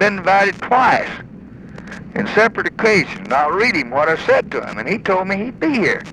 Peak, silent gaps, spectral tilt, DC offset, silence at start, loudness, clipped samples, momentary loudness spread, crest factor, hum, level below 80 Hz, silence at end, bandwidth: 0 dBFS; none; -5 dB/octave; under 0.1%; 0 s; -16 LUFS; under 0.1%; 15 LU; 16 dB; none; -48 dBFS; 0 s; 12 kHz